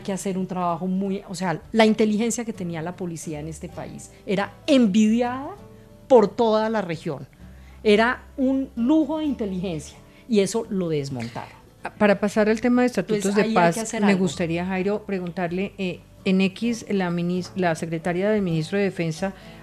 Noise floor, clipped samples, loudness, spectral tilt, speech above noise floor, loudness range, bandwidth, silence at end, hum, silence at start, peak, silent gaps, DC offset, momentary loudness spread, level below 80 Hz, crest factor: -44 dBFS; under 0.1%; -23 LUFS; -5.5 dB/octave; 22 dB; 4 LU; 13.5 kHz; 0 s; none; 0 s; -4 dBFS; none; under 0.1%; 14 LU; -52 dBFS; 20 dB